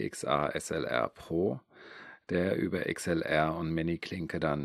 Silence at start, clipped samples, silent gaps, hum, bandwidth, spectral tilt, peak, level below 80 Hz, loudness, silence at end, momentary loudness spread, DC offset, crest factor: 0 s; under 0.1%; none; none; 14.5 kHz; -5.5 dB/octave; -12 dBFS; -60 dBFS; -32 LUFS; 0 s; 12 LU; under 0.1%; 20 dB